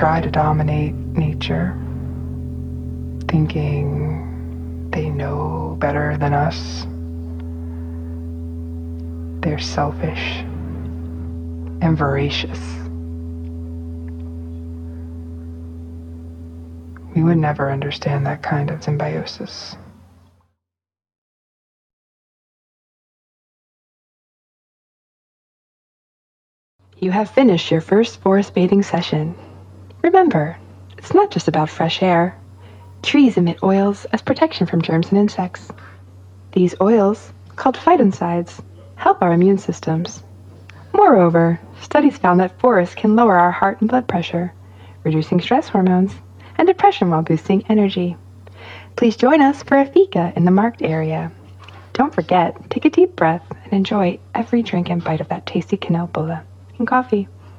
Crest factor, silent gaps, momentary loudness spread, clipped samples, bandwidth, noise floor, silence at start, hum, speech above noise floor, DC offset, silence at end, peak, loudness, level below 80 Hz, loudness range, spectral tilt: 18 dB; 21.18-26.79 s; 16 LU; under 0.1%; 8.8 kHz; -88 dBFS; 0 s; none; 72 dB; under 0.1%; 0 s; 0 dBFS; -18 LUFS; -38 dBFS; 9 LU; -7.5 dB/octave